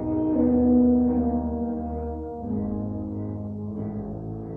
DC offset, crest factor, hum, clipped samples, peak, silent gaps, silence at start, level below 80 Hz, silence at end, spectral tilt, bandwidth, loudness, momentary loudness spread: under 0.1%; 14 dB; none; under 0.1%; -10 dBFS; none; 0 s; -40 dBFS; 0 s; -13.5 dB/octave; 2.1 kHz; -25 LUFS; 14 LU